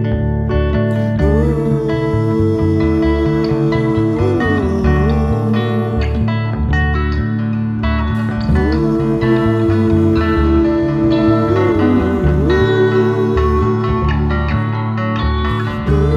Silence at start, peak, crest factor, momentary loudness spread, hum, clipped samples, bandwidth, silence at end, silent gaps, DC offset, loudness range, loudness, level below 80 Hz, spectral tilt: 0 s; -2 dBFS; 12 dB; 4 LU; none; under 0.1%; 7.2 kHz; 0 s; none; under 0.1%; 3 LU; -15 LUFS; -22 dBFS; -9 dB/octave